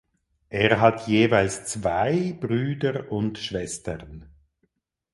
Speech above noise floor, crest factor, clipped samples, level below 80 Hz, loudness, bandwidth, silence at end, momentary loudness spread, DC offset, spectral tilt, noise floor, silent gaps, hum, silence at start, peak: 50 dB; 22 dB; under 0.1%; -50 dBFS; -24 LUFS; 11.5 kHz; 0.9 s; 14 LU; under 0.1%; -5.5 dB/octave; -73 dBFS; none; none; 0.5 s; -2 dBFS